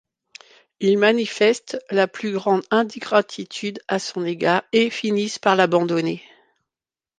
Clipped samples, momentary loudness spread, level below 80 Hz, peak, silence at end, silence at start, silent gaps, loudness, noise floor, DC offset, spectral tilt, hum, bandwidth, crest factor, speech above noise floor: under 0.1%; 10 LU; -72 dBFS; -2 dBFS; 1 s; 0.8 s; none; -21 LUFS; under -90 dBFS; under 0.1%; -4.5 dB/octave; none; 9.6 kHz; 18 dB; over 70 dB